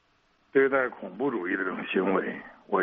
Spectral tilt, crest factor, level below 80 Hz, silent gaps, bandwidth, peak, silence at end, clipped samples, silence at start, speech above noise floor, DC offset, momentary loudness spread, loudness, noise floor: -4 dB/octave; 18 dB; -72 dBFS; none; 3.8 kHz; -10 dBFS; 0 s; under 0.1%; 0.55 s; 40 dB; under 0.1%; 8 LU; -28 LUFS; -67 dBFS